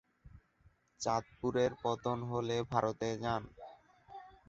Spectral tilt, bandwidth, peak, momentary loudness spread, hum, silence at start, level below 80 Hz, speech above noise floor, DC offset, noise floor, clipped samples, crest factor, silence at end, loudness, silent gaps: -5 dB/octave; 8 kHz; -14 dBFS; 20 LU; none; 0.25 s; -64 dBFS; 34 dB; under 0.1%; -69 dBFS; under 0.1%; 22 dB; 0.2 s; -36 LUFS; none